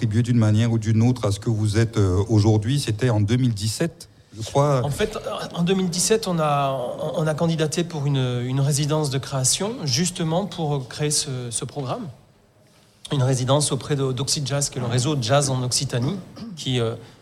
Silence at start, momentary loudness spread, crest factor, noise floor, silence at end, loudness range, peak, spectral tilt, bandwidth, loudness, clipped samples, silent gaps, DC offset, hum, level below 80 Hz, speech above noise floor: 0 s; 8 LU; 16 dB; -55 dBFS; 0.1 s; 4 LU; -6 dBFS; -5 dB/octave; 15 kHz; -22 LUFS; under 0.1%; none; under 0.1%; none; -50 dBFS; 34 dB